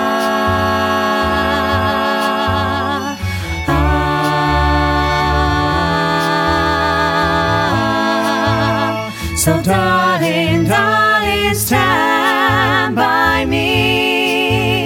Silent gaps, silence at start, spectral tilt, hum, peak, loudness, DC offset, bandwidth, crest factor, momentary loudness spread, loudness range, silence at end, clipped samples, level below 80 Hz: none; 0 s; -4.5 dB/octave; none; -2 dBFS; -14 LUFS; under 0.1%; 18 kHz; 12 dB; 4 LU; 3 LU; 0 s; under 0.1%; -28 dBFS